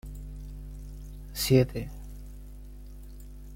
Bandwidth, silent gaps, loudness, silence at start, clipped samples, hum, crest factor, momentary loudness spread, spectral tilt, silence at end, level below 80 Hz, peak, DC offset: 16.5 kHz; none; -27 LUFS; 0.05 s; under 0.1%; 50 Hz at -40 dBFS; 22 dB; 24 LU; -6 dB/octave; 0 s; -42 dBFS; -10 dBFS; under 0.1%